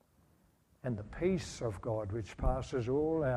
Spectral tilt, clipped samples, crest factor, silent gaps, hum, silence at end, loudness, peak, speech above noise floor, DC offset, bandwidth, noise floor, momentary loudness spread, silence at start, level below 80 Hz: -7 dB/octave; under 0.1%; 18 dB; none; none; 0 s; -36 LUFS; -18 dBFS; 35 dB; under 0.1%; 12 kHz; -69 dBFS; 8 LU; 0.85 s; -44 dBFS